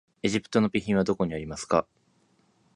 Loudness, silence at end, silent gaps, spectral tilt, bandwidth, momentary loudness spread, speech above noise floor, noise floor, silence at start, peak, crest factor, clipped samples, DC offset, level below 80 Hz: -27 LUFS; 0.95 s; none; -5.5 dB/octave; 11 kHz; 4 LU; 40 dB; -66 dBFS; 0.25 s; -8 dBFS; 20 dB; under 0.1%; under 0.1%; -54 dBFS